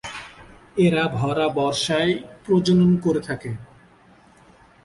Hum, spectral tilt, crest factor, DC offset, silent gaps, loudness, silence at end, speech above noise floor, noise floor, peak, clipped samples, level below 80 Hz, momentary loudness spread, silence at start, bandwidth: none; -6 dB/octave; 16 dB; under 0.1%; none; -21 LUFS; 1.2 s; 32 dB; -52 dBFS; -8 dBFS; under 0.1%; -52 dBFS; 17 LU; 0.05 s; 11.5 kHz